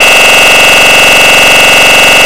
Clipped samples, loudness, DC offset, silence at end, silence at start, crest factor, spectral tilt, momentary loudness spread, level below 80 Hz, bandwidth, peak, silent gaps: 20%; 0 LUFS; 9%; 0 s; 0 s; 4 dB; -0.5 dB/octave; 0 LU; -30 dBFS; over 20 kHz; 0 dBFS; none